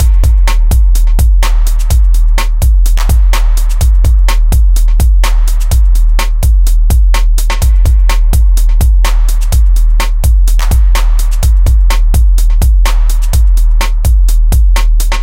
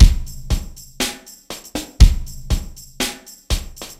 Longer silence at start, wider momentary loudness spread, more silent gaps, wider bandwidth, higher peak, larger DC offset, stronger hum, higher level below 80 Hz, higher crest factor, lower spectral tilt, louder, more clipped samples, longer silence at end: about the same, 0 s vs 0 s; second, 2 LU vs 20 LU; neither; about the same, 16.5 kHz vs 15.5 kHz; about the same, 0 dBFS vs 0 dBFS; neither; neither; first, -6 dBFS vs -18 dBFS; second, 6 dB vs 18 dB; about the same, -4.5 dB/octave vs -4.5 dB/octave; first, -11 LUFS vs -21 LUFS; second, under 0.1% vs 0.5%; second, 0 s vs 0.15 s